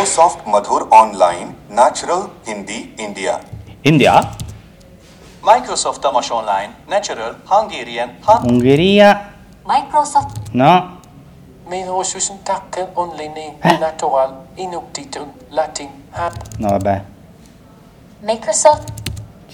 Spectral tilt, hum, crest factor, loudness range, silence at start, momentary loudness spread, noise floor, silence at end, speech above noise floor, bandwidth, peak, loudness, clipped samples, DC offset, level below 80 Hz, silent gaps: -4.5 dB/octave; none; 16 dB; 7 LU; 0 s; 17 LU; -43 dBFS; 0.25 s; 28 dB; 19 kHz; 0 dBFS; -15 LUFS; 0.3%; under 0.1%; -44 dBFS; none